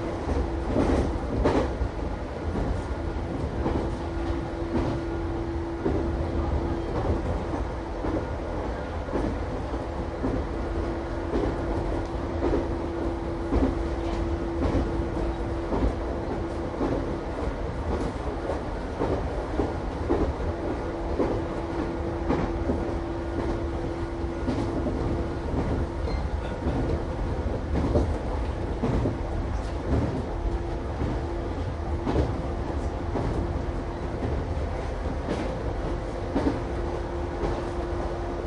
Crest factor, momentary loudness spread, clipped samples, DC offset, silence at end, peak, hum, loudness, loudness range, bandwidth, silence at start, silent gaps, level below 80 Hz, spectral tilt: 18 dB; 5 LU; under 0.1%; under 0.1%; 0 s; -10 dBFS; none; -29 LUFS; 2 LU; 10.5 kHz; 0 s; none; -32 dBFS; -8 dB/octave